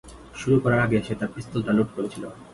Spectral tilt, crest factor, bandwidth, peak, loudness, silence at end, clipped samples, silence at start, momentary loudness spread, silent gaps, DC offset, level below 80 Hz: -7.5 dB/octave; 18 dB; 11.5 kHz; -8 dBFS; -24 LUFS; 0 s; under 0.1%; 0.05 s; 12 LU; none; under 0.1%; -50 dBFS